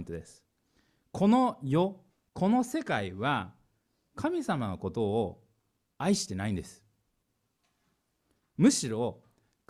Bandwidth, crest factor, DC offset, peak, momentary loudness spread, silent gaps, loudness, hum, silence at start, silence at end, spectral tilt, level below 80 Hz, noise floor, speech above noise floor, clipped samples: 14 kHz; 22 dB; under 0.1%; -10 dBFS; 18 LU; none; -30 LUFS; none; 0 s; 0.55 s; -5.5 dB/octave; -62 dBFS; -78 dBFS; 49 dB; under 0.1%